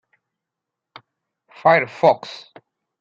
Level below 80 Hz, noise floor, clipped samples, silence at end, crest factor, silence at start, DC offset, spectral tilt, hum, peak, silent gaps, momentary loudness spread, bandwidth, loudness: -72 dBFS; -84 dBFS; under 0.1%; 0.6 s; 20 dB; 1.65 s; under 0.1%; -6 dB/octave; none; -2 dBFS; none; 20 LU; 7.6 kHz; -18 LUFS